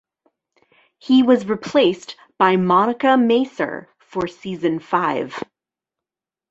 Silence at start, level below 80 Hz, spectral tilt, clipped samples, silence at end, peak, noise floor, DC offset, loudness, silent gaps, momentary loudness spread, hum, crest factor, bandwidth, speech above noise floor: 1.05 s; -62 dBFS; -6.5 dB/octave; under 0.1%; 1.1 s; -2 dBFS; -89 dBFS; under 0.1%; -18 LUFS; none; 17 LU; none; 18 dB; 7.8 kHz; 71 dB